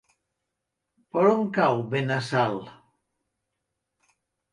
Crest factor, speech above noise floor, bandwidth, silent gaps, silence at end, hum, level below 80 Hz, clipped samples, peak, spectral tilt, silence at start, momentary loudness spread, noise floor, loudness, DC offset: 20 dB; 59 dB; 11.5 kHz; none; 1.8 s; none; -72 dBFS; under 0.1%; -8 dBFS; -7 dB/octave; 1.15 s; 8 LU; -83 dBFS; -24 LUFS; under 0.1%